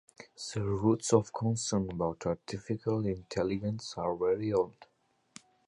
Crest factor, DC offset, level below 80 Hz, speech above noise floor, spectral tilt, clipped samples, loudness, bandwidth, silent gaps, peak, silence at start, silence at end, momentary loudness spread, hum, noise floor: 24 dB; under 0.1%; -58 dBFS; 26 dB; -6 dB/octave; under 0.1%; -32 LUFS; 11.5 kHz; none; -10 dBFS; 0.2 s; 0.85 s; 9 LU; none; -58 dBFS